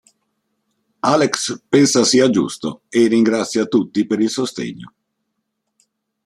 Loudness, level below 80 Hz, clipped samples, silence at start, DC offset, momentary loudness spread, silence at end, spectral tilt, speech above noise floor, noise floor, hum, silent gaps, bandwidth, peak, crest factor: -17 LUFS; -62 dBFS; under 0.1%; 1.05 s; under 0.1%; 11 LU; 1.35 s; -4 dB/octave; 58 dB; -74 dBFS; none; none; 13.5 kHz; 0 dBFS; 18 dB